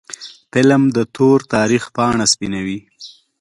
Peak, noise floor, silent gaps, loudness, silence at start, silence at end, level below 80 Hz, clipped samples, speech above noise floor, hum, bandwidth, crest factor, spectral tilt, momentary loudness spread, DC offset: 0 dBFS; -35 dBFS; none; -15 LUFS; 0.1 s; 0.3 s; -50 dBFS; under 0.1%; 20 dB; none; 11.5 kHz; 16 dB; -4.5 dB/octave; 14 LU; under 0.1%